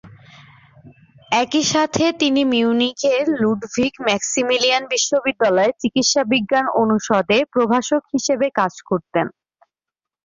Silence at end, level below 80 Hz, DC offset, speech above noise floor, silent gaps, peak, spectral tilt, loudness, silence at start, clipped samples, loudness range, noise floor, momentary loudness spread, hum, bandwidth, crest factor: 0.95 s; -58 dBFS; under 0.1%; 69 dB; none; -2 dBFS; -3 dB/octave; -18 LUFS; 0.05 s; under 0.1%; 2 LU; -87 dBFS; 5 LU; none; 7.6 kHz; 16 dB